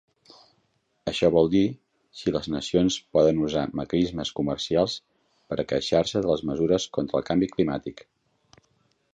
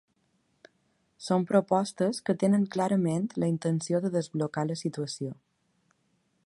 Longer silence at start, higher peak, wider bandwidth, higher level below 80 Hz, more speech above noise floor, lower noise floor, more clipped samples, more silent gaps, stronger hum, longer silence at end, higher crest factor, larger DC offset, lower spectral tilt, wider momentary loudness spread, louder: second, 1.05 s vs 1.2 s; about the same, -6 dBFS vs -8 dBFS; second, 9.4 kHz vs 11.5 kHz; first, -52 dBFS vs -72 dBFS; about the same, 46 dB vs 45 dB; about the same, -70 dBFS vs -73 dBFS; neither; neither; neither; about the same, 1.2 s vs 1.15 s; about the same, 20 dB vs 20 dB; neither; about the same, -5.5 dB/octave vs -6.5 dB/octave; about the same, 10 LU vs 9 LU; first, -25 LUFS vs -28 LUFS